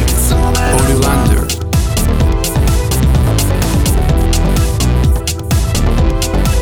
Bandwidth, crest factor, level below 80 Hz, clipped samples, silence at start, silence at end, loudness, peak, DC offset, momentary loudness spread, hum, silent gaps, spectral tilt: over 20 kHz; 12 dB; -14 dBFS; under 0.1%; 0 s; 0 s; -13 LUFS; 0 dBFS; under 0.1%; 3 LU; none; none; -5 dB/octave